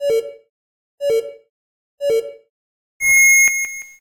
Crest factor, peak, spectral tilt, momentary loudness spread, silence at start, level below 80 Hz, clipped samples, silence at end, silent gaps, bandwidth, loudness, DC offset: 12 dB; -6 dBFS; 0.5 dB/octave; 23 LU; 0 s; -58 dBFS; under 0.1%; 0.15 s; 0.49-0.98 s, 1.49-1.98 s, 2.50-3.00 s; 16 kHz; -15 LUFS; under 0.1%